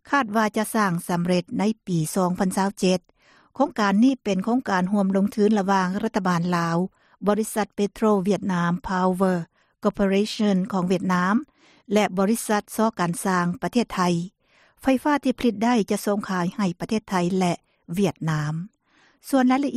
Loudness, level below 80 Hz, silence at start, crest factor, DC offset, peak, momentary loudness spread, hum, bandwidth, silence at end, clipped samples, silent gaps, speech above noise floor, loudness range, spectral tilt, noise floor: -23 LUFS; -56 dBFS; 0.1 s; 16 dB; under 0.1%; -8 dBFS; 6 LU; none; 14.5 kHz; 0 s; under 0.1%; none; 39 dB; 2 LU; -6 dB/octave; -61 dBFS